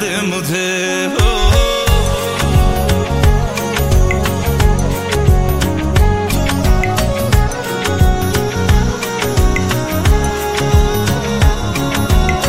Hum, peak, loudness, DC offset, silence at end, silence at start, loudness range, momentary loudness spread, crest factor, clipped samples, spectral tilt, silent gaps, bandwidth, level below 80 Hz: none; 0 dBFS; -15 LUFS; 2%; 0 s; 0 s; 1 LU; 3 LU; 12 dB; under 0.1%; -5 dB/octave; none; 16.5 kHz; -16 dBFS